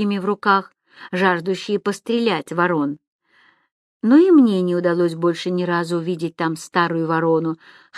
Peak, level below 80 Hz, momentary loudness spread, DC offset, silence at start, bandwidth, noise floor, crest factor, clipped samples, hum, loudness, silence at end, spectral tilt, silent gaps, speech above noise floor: -2 dBFS; -72 dBFS; 11 LU; under 0.1%; 0 s; 12.5 kHz; -57 dBFS; 18 dB; under 0.1%; none; -19 LUFS; 0 s; -6.5 dB/octave; 3.07-3.19 s, 3.72-4.00 s; 39 dB